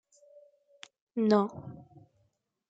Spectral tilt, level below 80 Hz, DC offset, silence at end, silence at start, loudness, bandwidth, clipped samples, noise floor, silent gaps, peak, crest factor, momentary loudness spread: -7.5 dB/octave; -74 dBFS; under 0.1%; 0.9 s; 1.15 s; -29 LUFS; 7.8 kHz; under 0.1%; -75 dBFS; none; -12 dBFS; 22 dB; 26 LU